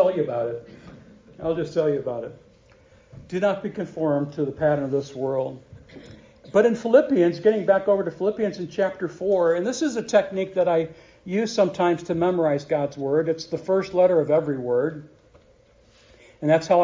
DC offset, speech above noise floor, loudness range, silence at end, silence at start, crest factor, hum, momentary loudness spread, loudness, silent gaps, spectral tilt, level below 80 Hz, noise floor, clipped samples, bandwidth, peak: under 0.1%; 34 dB; 6 LU; 0 s; 0 s; 20 dB; none; 10 LU; -23 LUFS; none; -6.5 dB/octave; -60 dBFS; -56 dBFS; under 0.1%; 7.6 kHz; -4 dBFS